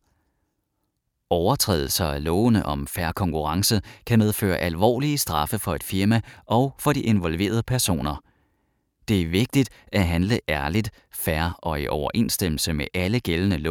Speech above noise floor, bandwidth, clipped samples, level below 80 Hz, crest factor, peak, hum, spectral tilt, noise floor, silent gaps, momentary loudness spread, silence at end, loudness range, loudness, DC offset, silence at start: 53 dB; 19 kHz; under 0.1%; -40 dBFS; 20 dB; -4 dBFS; none; -5 dB/octave; -76 dBFS; none; 6 LU; 0 s; 2 LU; -23 LUFS; under 0.1%; 1.3 s